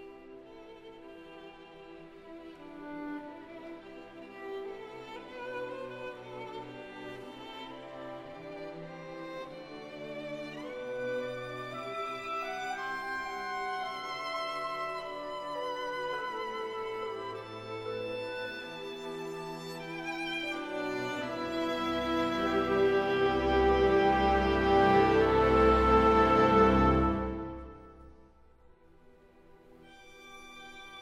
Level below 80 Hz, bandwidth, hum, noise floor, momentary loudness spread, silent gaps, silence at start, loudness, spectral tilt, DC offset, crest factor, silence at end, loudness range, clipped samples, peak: -46 dBFS; 14 kHz; none; -59 dBFS; 24 LU; none; 0 s; -30 LUFS; -6 dB/octave; under 0.1%; 20 dB; 0 s; 19 LU; under 0.1%; -12 dBFS